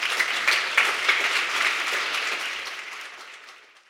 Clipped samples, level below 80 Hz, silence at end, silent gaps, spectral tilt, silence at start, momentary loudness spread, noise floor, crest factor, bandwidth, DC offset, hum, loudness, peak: under 0.1%; -72 dBFS; 0.3 s; none; 1.5 dB/octave; 0 s; 18 LU; -49 dBFS; 24 dB; 16.5 kHz; under 0.1%; none; -22 LUFS; -2 dBFS